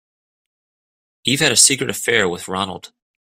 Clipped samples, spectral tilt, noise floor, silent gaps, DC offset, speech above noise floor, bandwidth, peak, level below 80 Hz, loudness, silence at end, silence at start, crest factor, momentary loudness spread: under 0.1%; -1.5 dB/octave; under -90 dBFS; none; under 0.1%; over 72 dB; 16 kHz; 0 dBFS; -58 dBFS; -16 LUFS; 0.45 s; 1.25 s; 20 dB; 14 LU